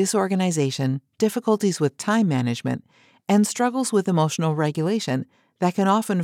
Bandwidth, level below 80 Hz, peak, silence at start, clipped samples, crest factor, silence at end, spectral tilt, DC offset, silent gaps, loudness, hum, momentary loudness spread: 16 kHz; -78 dBFS; -6 dBFS; 0 s; under 0.1%; 16 dB; 0 s; -5.5 dB/octave; under 0.1%; none; -22 LUFS; none; 7 LU